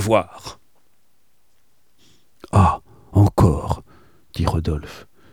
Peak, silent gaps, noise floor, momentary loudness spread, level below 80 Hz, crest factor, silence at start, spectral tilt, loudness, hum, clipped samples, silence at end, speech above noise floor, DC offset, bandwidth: 0 dBFS; none; -66 dBFS; 21 LU; -34 dBFS; 20 dB; 0 s; -7.5 dB/octave; -20 LUFS; none; under 0.1%; 0.3 s; 47 dB; 0.3%; 15 kHz